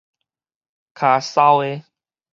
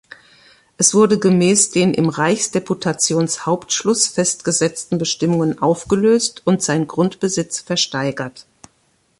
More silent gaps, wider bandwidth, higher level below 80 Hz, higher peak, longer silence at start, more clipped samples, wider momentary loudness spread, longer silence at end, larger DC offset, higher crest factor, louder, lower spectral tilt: neither; second, 7.6 kHz vs 11.5 kHz; second, -76 dBFS vs -56 dBFS; about the same, -2 dBFS vs 0 dBFS; first, 1 s vs 0.8 s; neither; first, 12 LU vs 7 LU; second, 0.5 s vs 0.8 s; neither; about the same, 18 dB vs 18 dB; about the same, -17 LUFS vs -17 LUFS; about the same, -5 dB/octave vs -4 dB/octave